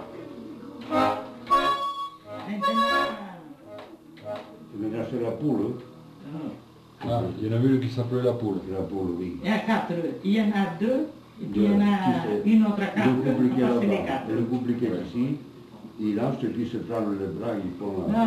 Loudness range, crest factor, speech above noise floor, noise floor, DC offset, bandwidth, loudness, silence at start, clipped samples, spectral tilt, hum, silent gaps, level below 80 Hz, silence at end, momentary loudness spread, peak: 8 LU; 16 dB; 22 dB; -46 dBFS; under 0.1%; 13.5 kHz; -26 LUFS; 0 s; under 0.1%; -7.5 dB/octave; none; none; -58 dBFS; 0 s; 18 LU; -10 dBFS